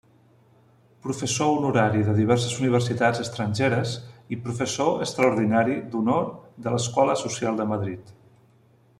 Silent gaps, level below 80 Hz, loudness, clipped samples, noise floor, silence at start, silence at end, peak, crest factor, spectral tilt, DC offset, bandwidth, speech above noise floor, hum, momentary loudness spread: none; -60 dBFS; -24 LUFS; under 0.1%; -58 dBFS; 1.05 s; 0.85 s; -6 dBFS; 18 dB; -5.5 dB/octave; under 0.1%; 12.5 kHz; 35 dB; none; 12 LU